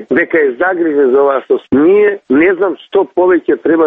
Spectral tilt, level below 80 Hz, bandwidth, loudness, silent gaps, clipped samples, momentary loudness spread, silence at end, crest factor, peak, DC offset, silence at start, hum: -9 dB/octave; -52 dBFS; 3.8 kHz; -11 LUFS; none; under 0.1%; 5 LU; 0 s; 10 dB; 0 dBFS; under 0.1%; 0 s; none